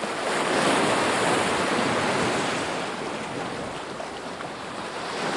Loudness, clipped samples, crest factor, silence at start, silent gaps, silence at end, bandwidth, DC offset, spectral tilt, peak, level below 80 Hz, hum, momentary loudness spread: -25 LUFS; under 0.1%; 16 dB; 0 s; none; 0 s; 11.5 kHz; under 0.1%; -3.5 dB/octave; -10 dBFS; -60 dBFS; none; 12 LU